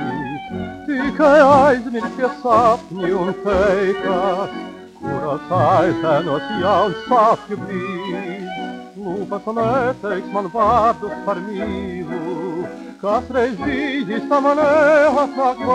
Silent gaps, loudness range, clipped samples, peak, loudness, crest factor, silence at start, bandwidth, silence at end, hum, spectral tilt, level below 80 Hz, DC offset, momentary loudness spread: none; 6 LU; under 0.1%; 0 dBFS; -18 LUFS; 16 dB; 0 s; 10.5 kHz; 0 s; none; -6.5 dB/octave; -46 dBFS; under 0.1%; 14 LU